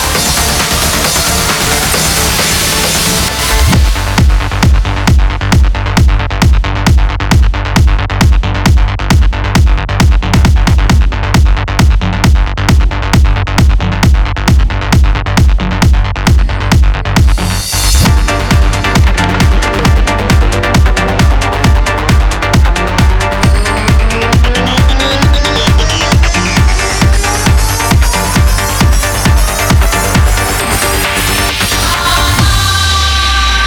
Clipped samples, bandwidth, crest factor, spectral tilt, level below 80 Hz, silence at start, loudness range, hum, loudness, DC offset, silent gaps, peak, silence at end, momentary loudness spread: under 0.1%; over 20 kHz; 8 dB; -4 dB/octave; -12 dBFS; 0 s; 1 LU; none; -10 LUFS; under 0.1%; none; -2 dBFS; 0 s; 2 LU